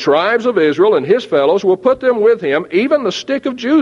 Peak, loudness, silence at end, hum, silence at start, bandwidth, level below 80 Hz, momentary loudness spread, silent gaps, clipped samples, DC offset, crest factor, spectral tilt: 0 dBFS; -14 LUFS; 0 s; none; 0 s; 7.4 kHz; -58 dBFS; 5 LU; none; under 0.1%; under 0.1%; 12 dB; -5.5 dB/octave